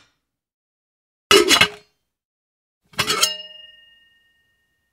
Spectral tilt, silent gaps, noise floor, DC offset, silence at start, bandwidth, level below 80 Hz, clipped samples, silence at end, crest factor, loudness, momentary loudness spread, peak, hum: -1 dB/octave; 2.25-2.81 s; -69 dBFS; under 0.1%; 1.3 s; 16 kHz; -56 dBFS; under 0.1%; 1.45 s; 24 dB; -16 LUFS; 19 LU; 0 dBFS; none